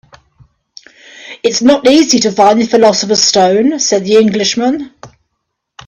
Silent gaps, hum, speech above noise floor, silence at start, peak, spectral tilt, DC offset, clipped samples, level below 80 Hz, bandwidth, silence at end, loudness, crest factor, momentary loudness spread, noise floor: none; none; 62 dB; 1.2 s; 0 dBFS; -3 dB/octave; under 0.1%; under 0.1%; -52 dBFS; 10.5 kHz; 0.8 s; -10 LUFS; 12 dB; 8 LU; -71 dBFS